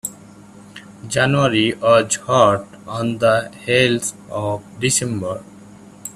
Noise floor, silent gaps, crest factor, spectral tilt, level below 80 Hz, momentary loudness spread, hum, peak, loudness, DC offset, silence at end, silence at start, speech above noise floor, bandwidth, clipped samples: -42 dBFS; none; 18 dB; -4 dB/octave; -52 dBFS; 14 LU; none; 0 dBFS; -18 LUFS; under 0.1%; 0.05 s; 0.05 s; 24 dB; 15 kHz; under 0.1%